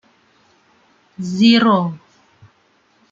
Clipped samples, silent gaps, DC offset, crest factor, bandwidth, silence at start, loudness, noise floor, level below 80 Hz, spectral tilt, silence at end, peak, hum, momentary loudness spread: under 0.1%; none; under 0.1%; 18 dB; 7.6 kHz; 1.2 s; -15 LUFS; -58 dBFS; -64 dBFS; -6 dB/octave; 1.15 s; -2 dBFS; none; 18 LU